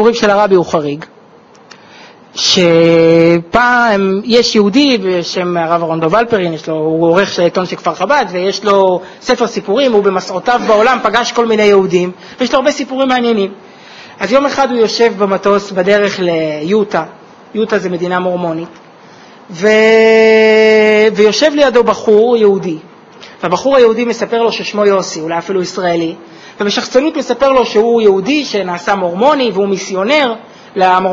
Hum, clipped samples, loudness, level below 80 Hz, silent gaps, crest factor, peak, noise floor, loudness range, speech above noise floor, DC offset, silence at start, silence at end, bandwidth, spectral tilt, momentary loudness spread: none; under 0.1%; -11 LUFS; -50 dBFS; none; 12 dB; 0 dBFS; -41 dBFS; 5 LU; 30 dB; under 0.1%; 0 s; 0 s; 7.6 kHz; -4.5 dB/octave; 10 LU